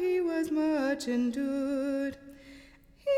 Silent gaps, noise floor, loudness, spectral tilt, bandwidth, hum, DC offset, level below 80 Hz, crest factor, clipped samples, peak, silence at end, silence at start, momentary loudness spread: none; -56 dBFS; -30 LUFS; -4.5 dB/octave; 15 kHz; none; under 0.1%; -62 dBFS; 12 dB; under 0.1%; -18 dBFS; 0 s; 0 s; 16 LU